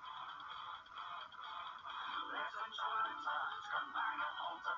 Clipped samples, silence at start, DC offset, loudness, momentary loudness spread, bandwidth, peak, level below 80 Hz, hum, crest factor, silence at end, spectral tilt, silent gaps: under 0.1%; 0 s; under 0.1%; -43 LUFS; 9 LU; 7.6 kHz; -28 dBFS; -82 dBFS; none; 16 dB; 0 s; -2 dB/octave; none